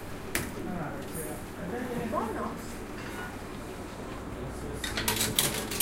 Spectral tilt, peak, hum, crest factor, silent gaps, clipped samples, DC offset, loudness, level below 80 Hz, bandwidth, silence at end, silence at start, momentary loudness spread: -3 dB/octave; -6 dBFS; none; 28 dB; none; under 0.1%; under 0.1%; -33 LUFS; -46 dBFS; 16.5 kHz; 0 s; 0 s; 13 LU